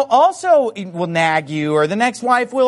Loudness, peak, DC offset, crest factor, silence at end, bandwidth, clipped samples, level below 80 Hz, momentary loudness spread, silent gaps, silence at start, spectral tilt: -16 LUFS; -2 dBFS; under 0.1%; 14 dB; 0 s; 11.5 kHz; under 0.1%; -64 dBFS; 7 LU; none; 0 s; -5 dB/octave